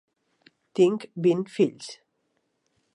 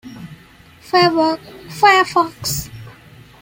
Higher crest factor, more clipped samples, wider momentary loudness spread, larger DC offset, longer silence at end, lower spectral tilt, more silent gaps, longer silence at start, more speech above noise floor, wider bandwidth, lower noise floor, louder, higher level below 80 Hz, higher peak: about the same, 18 dB vs 18 dB; neither; second, 16 LU vs 22 LU; neither; first, 1 s vs 0.5 s; first, -6.5 dB/octave vs -3.5 dB/octave; neither; first, 0.75 s vs 0.05 s; first, 51 dB vs 30 dB; second, 10.5 kHz vs 16.5 kHz; first, -74 dBFS vs -45 dBFS; second, -25 LUFS vs -16 LUFS; second, -80 dBFS vs -48 dBFS; second, -10 dBFS vs -2 dBFS